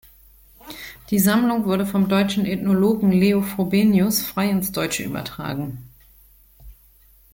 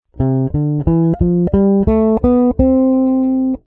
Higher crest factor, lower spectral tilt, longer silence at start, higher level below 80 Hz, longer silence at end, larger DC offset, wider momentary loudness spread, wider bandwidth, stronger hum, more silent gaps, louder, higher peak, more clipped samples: about the same, 16 dB vs 14 dB; second, -5.5 dB/octave vs -13.5 dB/octave; first, 0.65 s vs 0.15 s; second, -50 dBFS vs -28 dBFS; first, 0.6 s vs 0.1 s; neither; first, 15 LU vs 4 LU; first, 17 kHz vs 2.9 kHz; neither; neither; second, -20 LUFS vs -14 LUFS; second, -6 dBFS vs 0 dBFS; neither